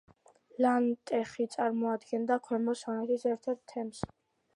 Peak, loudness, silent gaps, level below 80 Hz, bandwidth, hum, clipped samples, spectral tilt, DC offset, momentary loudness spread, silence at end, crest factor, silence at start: -14 dBFS; -32 LUFS; none; -68 dBFS; 11 kHz; none; under 0.1%; -5.5 dB/octave; under 0.1%; 11 LU; 0.5 s; 18 dB; 0.55 s